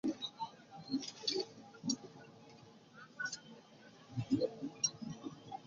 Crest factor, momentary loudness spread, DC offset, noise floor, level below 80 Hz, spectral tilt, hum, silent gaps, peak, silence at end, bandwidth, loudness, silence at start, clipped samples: 22 dB; 21 LU; under 0.1%; -60 dBFS; -76 dBFS; -3.5 dB/octave; none; none; -22 dBFS; 0 s; 7.4 kHz; -41 LUFS; 0.05 s; under 0.1%